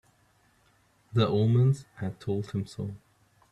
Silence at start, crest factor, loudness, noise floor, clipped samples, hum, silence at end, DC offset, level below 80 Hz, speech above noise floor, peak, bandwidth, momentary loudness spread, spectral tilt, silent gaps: 1.15 s; 18 dB; -28 LUFS; -66 dBFS; under 0.1%; none; 0.55 s; under 0.1%; -62 dBFS; 39 dB; -10 dBFS; 10 kHz; 15 LU; -8 dB/octave; none